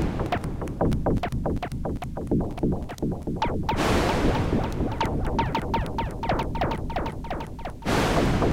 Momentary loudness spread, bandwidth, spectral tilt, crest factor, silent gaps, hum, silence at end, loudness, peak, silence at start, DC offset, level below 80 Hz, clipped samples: 9 LU; 17 kHz; -6.5 dB/octave; 16 dB; none; none; 0 s; -27 LUFS; -10 dBFS; 0 s; under 0.1%; -32 dBFS; under 0.1%